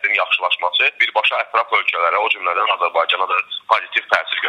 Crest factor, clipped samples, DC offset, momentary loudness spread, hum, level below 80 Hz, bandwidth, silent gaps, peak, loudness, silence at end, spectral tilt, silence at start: 18 dB; under 0.1%; under 0.1%; 4 LU; none; -68 dBFS; 11.5 kHz; none; 0 dBFS; -17 LUFS; 0 s; -0.5 dB/octave; 0 s